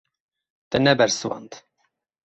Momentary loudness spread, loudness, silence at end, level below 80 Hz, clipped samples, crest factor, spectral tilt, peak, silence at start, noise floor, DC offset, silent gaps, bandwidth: 14 LU; -21 LUFS; 0.65 s; -56 dBFS; under 0.1%; 22 dB; -4 dB/octave; -2 dBFS; 0.7 s; -72 dBFS; under 0.1%; none; 8.2 kHz